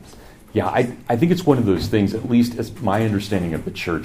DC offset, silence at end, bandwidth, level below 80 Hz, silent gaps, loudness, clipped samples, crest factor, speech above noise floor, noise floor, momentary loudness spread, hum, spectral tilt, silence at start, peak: under 0.1%; 0 s; 15.5 kHz; -44 dBFS; none; -20 LUFS; under 0.1%; 20 dB; 23 dB; -43 dBFS; 8 LU; none; -7 dB/octave; 0 s; 0 dBFS